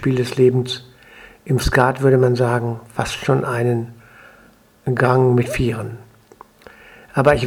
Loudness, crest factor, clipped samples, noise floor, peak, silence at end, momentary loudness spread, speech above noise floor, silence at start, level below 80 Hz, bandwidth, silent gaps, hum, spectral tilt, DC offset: -18 LUFS; 18 dB; under 0.1%; -50 dBFS; 0 dBFS; 0 s; 14 LU; 34 dB; 0 s; -38 dBFS; 16 kHz; none; none; -6.5 dB/octave; under 0.1%